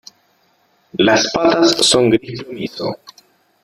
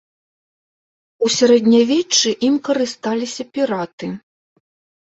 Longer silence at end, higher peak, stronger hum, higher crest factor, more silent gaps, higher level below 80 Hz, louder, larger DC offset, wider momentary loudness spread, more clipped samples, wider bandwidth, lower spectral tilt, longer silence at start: second, 0.65 s vs 0.9 s; about the same, -2 dBFS vs -2 dBFS; neither; about the same, 16 dB vs 16 dB; second, none vs 3.93-3.98 s; first, -54 dBFS vs -64 dBFS; first, -14 LUFS vs -17 LUFS; neither; about the same, 16 LU vs 14 LU; neither; first, 14.5 kHz vs 8.2 kHz; about the same, -3.5 dB/octave vs -3 dB/octave; second, 0.95 s vs 1.2 s